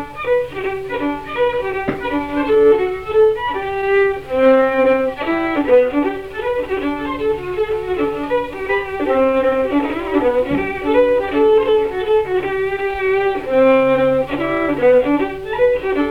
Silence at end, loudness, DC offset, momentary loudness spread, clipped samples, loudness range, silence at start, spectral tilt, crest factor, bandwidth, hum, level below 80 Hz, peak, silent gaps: 0 s; -17 LUFS; 0.4%; 8 LU; under 0.1%; 3 LU; 0 s; -6.5 dB/octave; 14 dB; 6 kHz; none; -42 dBFS; -2 dBFS; none